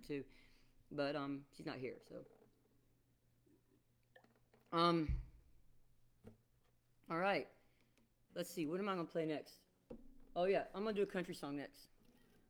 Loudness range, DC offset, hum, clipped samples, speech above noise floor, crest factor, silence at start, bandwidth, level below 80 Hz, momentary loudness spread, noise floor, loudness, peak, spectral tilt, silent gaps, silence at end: 7 LU; under 0.1%; none; under 0.1%; 35 dB; 22 dB; 0 s; over 20 kHz; -60 dBFS; 20 LU; -76 dBFS; -42 LUFS; -22 dBFS; -6 dB/octave; none; 0.65 s